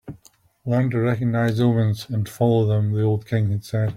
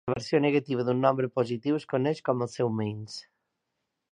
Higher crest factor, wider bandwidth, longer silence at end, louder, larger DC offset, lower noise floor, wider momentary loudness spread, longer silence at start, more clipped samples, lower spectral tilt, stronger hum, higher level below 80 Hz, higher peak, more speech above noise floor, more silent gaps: second, 14 dB vs 20 dB; first, 15 kHz vs 10.5 kHz; second, 0 s vs 0.9 s; first, -21 LUFS vs -28 LUFS; neither; second, -55 dBFS vs -82 dBFS; second, 6 LU vs 9 LU; about the same, 0.05 s vs 0.05 s; neither; about the same, -8 dB/octave vs -7 dB/octave; neither; first, -54 dBFS vs -66 dBFS; about the same, -6 dBFS vs -8 dBFS; second, 35 dB vs 55 dB; neither